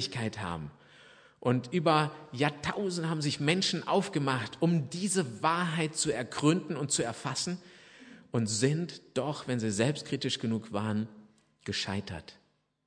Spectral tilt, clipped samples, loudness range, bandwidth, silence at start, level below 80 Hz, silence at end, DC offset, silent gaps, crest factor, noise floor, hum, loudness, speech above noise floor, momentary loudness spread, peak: -4.5 dB/octave; under 0.1%; 4 LU; 10.5 kHz; 0 s; -66 dBFS; 0.55 s; under 0.1%; none; 22 dB; -57 dBFS; none; -31 LUFS; 26 dB; 8 LU; -10 dBFS